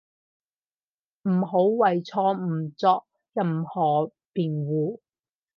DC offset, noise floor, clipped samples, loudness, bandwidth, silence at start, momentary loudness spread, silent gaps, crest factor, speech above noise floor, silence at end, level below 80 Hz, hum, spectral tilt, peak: under 0.1%; under -90 dBFS; under 0.1%; -25 LUFS; 6.6 kHz; 1.25 s; 9 LU; none; 18 dB; over 66 dB; 0.6 s; -76 dBFS; none; -9 dB/octave; -8 dBFS